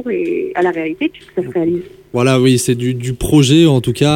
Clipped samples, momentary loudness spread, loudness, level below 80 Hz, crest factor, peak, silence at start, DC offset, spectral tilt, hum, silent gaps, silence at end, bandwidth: under 0.1%; 10 LU; -15 LUFS; -38 dBFS; 14 dB; 0 dBFS; 0 s; under 0.1%; -6 dB/octave; none; none; 0 s; 17 kHz